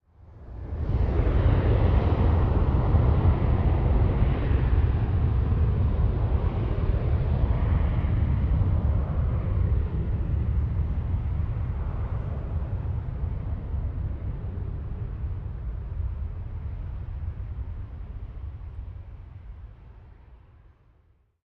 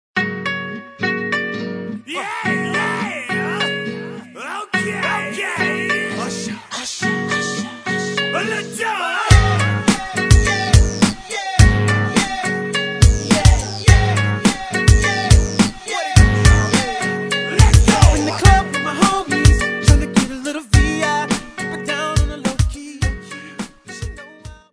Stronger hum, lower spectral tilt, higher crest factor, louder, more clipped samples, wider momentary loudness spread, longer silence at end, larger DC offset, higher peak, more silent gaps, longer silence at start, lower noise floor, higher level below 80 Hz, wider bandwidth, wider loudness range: neither; first, -11 dB/octave vs -4.5 dB/octave; about the same, 16 dB vs 16 dB; second, -27 LUFS vs -17 LUFS; neither; first, 16 LU vs 13 LU; first, 1.1 s vs 0.2 s; neither; second, -8 dBFS vs 0 dBFS; neither; about the same, 0.2 s vs 0.15 s; first, -62 dBFS vs -38 dBFS; second, -28 dBFS vs -22 dBFS; second, 4.4 kHz vs 11 kHz; first, 14 LU vs 7 LU